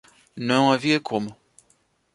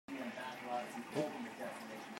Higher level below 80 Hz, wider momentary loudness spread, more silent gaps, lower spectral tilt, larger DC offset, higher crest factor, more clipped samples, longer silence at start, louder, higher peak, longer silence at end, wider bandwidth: first, -66 dBFS vs -86 dBFS; first, 12 LU vs 5 LU; neither; about the same, -5 dB/octave vs -4.5 dB/octave; neither; about the same, 20 dB vs 20 dB; neither; first, 0.35 s vs 0.1 s; first, -22 LUFS vs -44 LUFS; first, -4 dBFS vs -24 dBFS; first, 0.8 s vs 0 s; second, 11.5 kHz vs 16 kHz